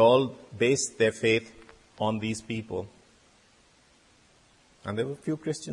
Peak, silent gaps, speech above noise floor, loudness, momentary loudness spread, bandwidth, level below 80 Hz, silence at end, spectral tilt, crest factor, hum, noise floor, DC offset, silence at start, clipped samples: -8 dBFS; none; 35 dB; -28 LUFS; 12 LU; 11.5 kHz; -64 dBFS; 0 s; -4.5 dB/octave; 20 dB; none; -61 dBFS; under 0.1%; 0 s; under 0.1%